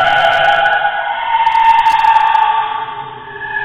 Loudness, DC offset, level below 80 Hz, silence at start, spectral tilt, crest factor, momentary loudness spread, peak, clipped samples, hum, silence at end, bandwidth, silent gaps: -12 LUFS; under 0.1%; -46 dBFS; 0 s; -2.5 dB/octave; 12 dB; 14 LU; 0 dBFS; under 0.1%; none; 0 s; 9.6 kHz; none